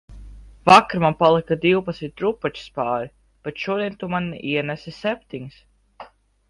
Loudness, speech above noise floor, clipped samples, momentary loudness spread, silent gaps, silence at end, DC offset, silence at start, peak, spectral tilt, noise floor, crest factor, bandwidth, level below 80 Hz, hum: -21 LUFS; 24 dB; under 0.1%; 20 LU; none; 0.45 s; under 0.1%; 0.1 s; 0 dBFS; -6 dB/octave; -45 dBFS; 22 dB; 11.5 kHz; -50 dBFS; none